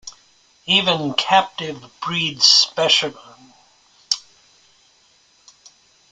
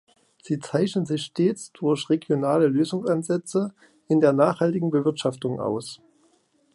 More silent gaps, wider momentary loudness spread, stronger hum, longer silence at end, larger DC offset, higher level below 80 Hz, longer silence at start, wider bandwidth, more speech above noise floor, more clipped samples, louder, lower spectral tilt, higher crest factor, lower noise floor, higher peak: neither; first, 18 LU vs 9 LU; neither; first, 1.9 s vs 0.8 s; neither; about the same, -66 dBFS vs -70 dBFS; second, 0.05 s vs 0.45 s; about the same, 12 kHz vs 11.5 kHz; about the same, 38 dB vs 41 dB; neither; first, -16 LUFS vs -24 LUFS; second, -1.5 dB/octave vs -6.5 dB/octave; about the same, 22 dB vs 20 dB; second, -57 dBFS vs -64 dBFS; first, 0 dBFS vs -4 dBFS